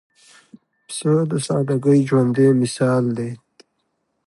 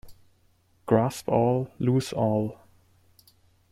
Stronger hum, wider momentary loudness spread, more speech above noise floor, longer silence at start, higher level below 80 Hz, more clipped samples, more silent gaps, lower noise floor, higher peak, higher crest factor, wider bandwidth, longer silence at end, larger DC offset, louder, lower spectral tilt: neither; first, 12 LU vs 6 LU; first, 54 dB vs 40 dB; first, 0.9 s vs 0.05 s; about the same, -62 dBFS vs -60 dBFS; neither; neither; first, -71 dBFS vs -64 dBFS; about the same, -6 dBFS vs -8 dBFS; second, 14 dB vs 20 dB; second, 11.5 kHz vs 15 kHz; second, 0.9 s vs 1.15 s; neither; first, -18 LUFS vs -26 LUFS; about the same, -7 dB/octave vs -7.5 dB/octave